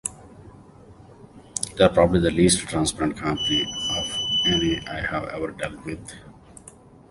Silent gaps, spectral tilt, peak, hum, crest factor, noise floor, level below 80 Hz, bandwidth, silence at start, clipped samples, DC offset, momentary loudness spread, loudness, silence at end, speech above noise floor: none; -3.5 dB/octave; -2 dBFS; none; 22 dB; -48 dBFS; -44 dBFS; 11.5 kHz; 0.05 s; under 0.1%; under 0.1%; 14 LU; -22 LUFS; 0.4 s; 26 dB